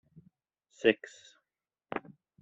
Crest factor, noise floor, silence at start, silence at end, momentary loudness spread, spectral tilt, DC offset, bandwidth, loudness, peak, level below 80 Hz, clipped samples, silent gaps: 28 dB; -90 dBFS; 0.85 s; 0.45 s; 14 LU; -4.5 dB/octave; under 0.1%; 7.8 kHz; -32 LUFS; -8 dBFS; -78 dBFS; under 0.1%; none